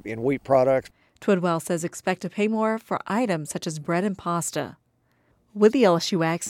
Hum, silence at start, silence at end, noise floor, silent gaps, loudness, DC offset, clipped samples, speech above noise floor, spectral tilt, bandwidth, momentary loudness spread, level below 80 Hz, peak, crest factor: none; 0.05 s; 0 s; -66 dBFS; none; -24 LUFS; under 0.1%; under 0.1%; 43 dB; -5 dB/octave; 16.5 kHz; 10 LU; -62 dBFS; -6 dBFS; 18 dB